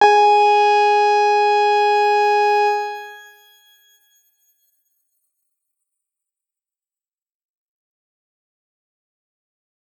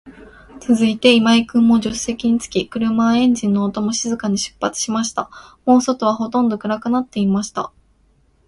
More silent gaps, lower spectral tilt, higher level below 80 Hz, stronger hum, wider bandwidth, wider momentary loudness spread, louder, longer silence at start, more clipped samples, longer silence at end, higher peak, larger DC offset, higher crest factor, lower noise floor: neither; second, -0.5 dB/octave vs -4.5 dB/octave; second, under -90 dBFS vs -50 dBFS; neither; first, 14 kHz vs 11.5 kHz; about the same, 11 LU vs 9 LU; about the same, -15 LUFS vs -17 LUFS; about the same, 0 s vs 0.05 s; neither; first, 6.8 s vs 0.8 s; about the same, -2 dBFS vs 0 dBFS; neither; about the same, 18 dB vs 18 dB; first, under -90 dBFS vs -57 dBFS